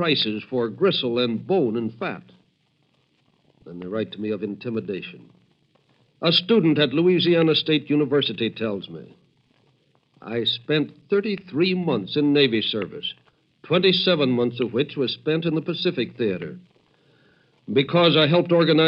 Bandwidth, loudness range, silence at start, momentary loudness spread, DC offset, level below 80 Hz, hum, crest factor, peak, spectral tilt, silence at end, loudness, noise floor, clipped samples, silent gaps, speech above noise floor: 5.8 kHz; 10 LU; 0 s; 13 LU; under 0.1%; -70 dBFS; none; 18 dB; -4 dBFS; -8.5 dB/octave; 0 s; -22 LUFS; -66 dBFS; under 0.1%; none; 44 dB